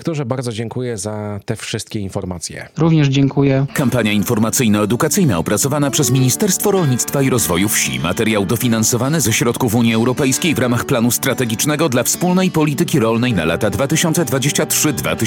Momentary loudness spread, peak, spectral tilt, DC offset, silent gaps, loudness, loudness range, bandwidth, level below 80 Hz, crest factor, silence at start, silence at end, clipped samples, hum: 9 LU; -2 dBFS; -4.5 dB/octave; under 0.1%; none; -16 LUFS; 2 LU; 18 kHz; -46 dBFS; 14 dB; 0 s; 0 s; under 0.1%; none